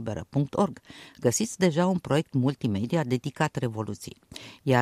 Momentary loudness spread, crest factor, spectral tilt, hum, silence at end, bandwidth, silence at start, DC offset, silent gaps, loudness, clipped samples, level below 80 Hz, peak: 16 LU; 18 dB; -5.5 dB/octave; none; 0 s; 15 kHz; 0 s; under 0.1%; none; -27 LUFS; under 0.1%; -60 dBFS; -8 dBFS